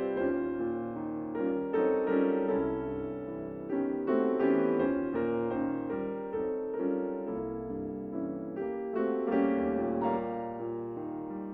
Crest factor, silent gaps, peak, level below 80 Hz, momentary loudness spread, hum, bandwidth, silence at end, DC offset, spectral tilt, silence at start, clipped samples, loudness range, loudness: 16 dB; none; -14 dBFS; -60 dBFS; 9 LU; none; 4 kHz; 0 s; under 0.1%; -10.5 dB/octave; 0 s; under 0.1%; 4 LU; -32 LUFS